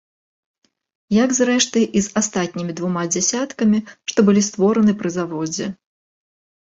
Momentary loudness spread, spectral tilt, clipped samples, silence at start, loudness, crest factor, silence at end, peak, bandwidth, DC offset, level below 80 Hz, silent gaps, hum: 8 LU; -4.5 dB/octave; under 0.1%; 1.1 s; -19 LUFS; 18 dB; 0.9 s; -2 dBFS; 8 kHz; under 0.1%; -58 dBFS; none; none